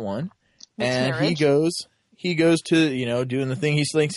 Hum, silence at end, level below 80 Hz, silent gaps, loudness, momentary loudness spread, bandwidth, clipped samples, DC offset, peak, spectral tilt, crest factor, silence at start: none; 0 s; -62 dBFS; none; -22 LUFS; 12 LU; 11.5 kHz; under 0.1%; under 0.1%; -8 dBFS; -5.5 dB/octave; 14 dB; 0 s